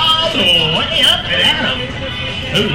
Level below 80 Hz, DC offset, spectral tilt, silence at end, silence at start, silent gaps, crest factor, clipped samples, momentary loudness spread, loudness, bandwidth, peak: -34 dBFS; under 0.1%; -3.5 dB/octave; 0 s; 0 s; none; 12 dB; under 0.1%; 10 LU; -12 LUFS; 16.5 kHz; -2 dBFS